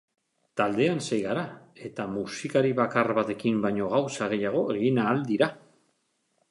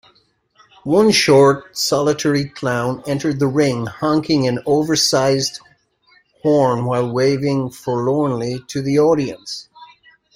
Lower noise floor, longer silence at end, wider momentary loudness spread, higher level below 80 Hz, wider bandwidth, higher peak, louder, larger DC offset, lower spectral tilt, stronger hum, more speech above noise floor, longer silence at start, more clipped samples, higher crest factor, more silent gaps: first, -73 dBFS vs -58 dBFS; first, 0.9 s vs 0.5 s; about the same, 9 LU vs 11 LU; second, -68 dBFS vs -54 dBFS; second, 11.5 kHz vs 16 kHz; second, -8 dBFS vs 0 dBFS; second, -27 LUFS vs -17 LUFS; neither; about the same, -6 dB/octave vs -5 dB/octave; neither; first, 47 dB vs 42 dB; second, 0.55 s vs 0.85 s; neither; about the same, 20 dB vs 18 dB; neither